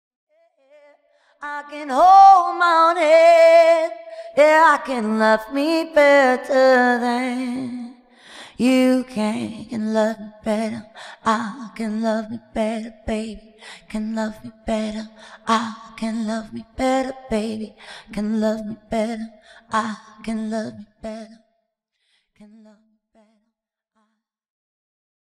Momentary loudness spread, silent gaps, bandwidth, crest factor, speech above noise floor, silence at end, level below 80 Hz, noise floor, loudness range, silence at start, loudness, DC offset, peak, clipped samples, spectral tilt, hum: 21 LU; none; 14.5 kHz; 18 dB; 60 dB; 4.05 s; -52 dBFS; -79 dBFS; 14 LU; 1.4 s; -18 LUFS; under 0.1%; -2 dBFS; under 0.1%; -5 dB/octave; none